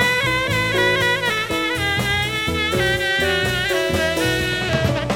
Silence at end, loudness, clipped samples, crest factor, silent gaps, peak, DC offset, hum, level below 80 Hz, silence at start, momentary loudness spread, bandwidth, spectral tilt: 0 s; -18 LUFS; under 0.1%; 14 dB; none; -4 dBFS; under 0.1%; none; -38 dBFS; 0 s; 3 LU; 17 kHz; -4 dB/octave